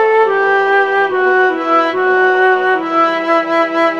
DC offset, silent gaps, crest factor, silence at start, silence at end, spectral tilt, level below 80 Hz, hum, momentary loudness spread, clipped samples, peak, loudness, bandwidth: 0.3%; none; 10 dB; 0 s; 0 s; -4.5 dB/octave; -66 dBFS; none; 2 LU; under 0.1%; -2 dBFS; -12 LUFS; 7.4 kHz